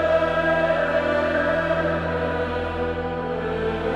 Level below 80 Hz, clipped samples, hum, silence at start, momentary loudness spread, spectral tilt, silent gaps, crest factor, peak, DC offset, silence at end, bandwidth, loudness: -40 dBFS; under 0.1%; none; 0 s; 6 LU; -7 dB/octave; none; 14 dB; -8 dBFS; under 0.1%; 0 s; 9.8 kHz; -23 LUFS